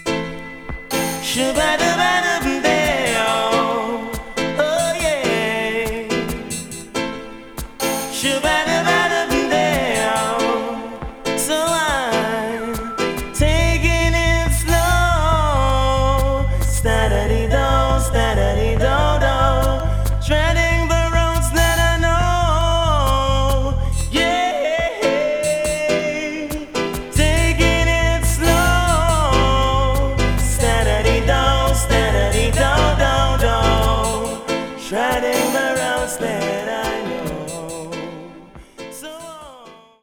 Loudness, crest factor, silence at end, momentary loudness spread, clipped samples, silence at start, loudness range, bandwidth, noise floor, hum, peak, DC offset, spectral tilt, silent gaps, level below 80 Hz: -18 LUFS; 16 dB; 0.3 s; 10 LU; under 0.1%; 0 s; 4 LU; 19.5 kHz; -43 dBFS; none; -2 dBFS; under 0.1%; -4.5 dB/octave; none; -24 dBFS